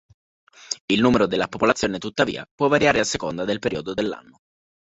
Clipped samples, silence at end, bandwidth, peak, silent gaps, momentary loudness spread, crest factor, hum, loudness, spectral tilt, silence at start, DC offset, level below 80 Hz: under 0.1%; 0.7 s; 8.4 kHz; -2 dBFS; 0.80-0.88 s, 2.51-2.58 s; 10 LU; 20 dB; none; -22 LUFS; -4.5 dB/octave; 0.7 s; under 0.1%; -52 dBFS